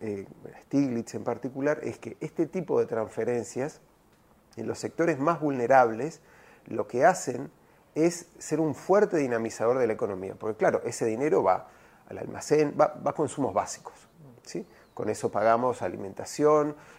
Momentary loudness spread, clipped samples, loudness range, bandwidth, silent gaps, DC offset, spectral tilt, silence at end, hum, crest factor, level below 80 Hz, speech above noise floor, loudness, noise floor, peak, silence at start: 15 LU; under 0.1%; 4 LU; 15.5 kHz; none; under 0.1%; -6 dB/octave; 0.05 s; none; 22 dB; -68 dBFS; 34 dB; -28 LUFS; -61 dBFS; -6 dBFS; 0 s